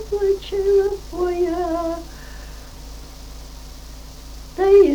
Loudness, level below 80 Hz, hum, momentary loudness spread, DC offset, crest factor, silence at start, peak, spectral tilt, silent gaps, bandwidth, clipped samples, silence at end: -20 LUFS; -36 dBFS; none; 21 LU; under 0.1%; 16 dB; 0 s; -4 dBFS; -6 dB/octave; none; 20 kHz; under 0.1%; 0 s